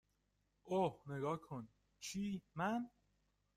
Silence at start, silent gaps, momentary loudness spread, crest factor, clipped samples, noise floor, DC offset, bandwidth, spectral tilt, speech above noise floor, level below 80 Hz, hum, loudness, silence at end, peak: 0.65 s; none; 13 LU; 18 dB; under 0.1%; -82 dBFS; under 0.1%; 15.5 kHz; -5.5 dB/octave; 40 dB; -76 dBFS; 50 Hz at -60 dBFS; -44 LUFS; 0.7 s; -26 dBFS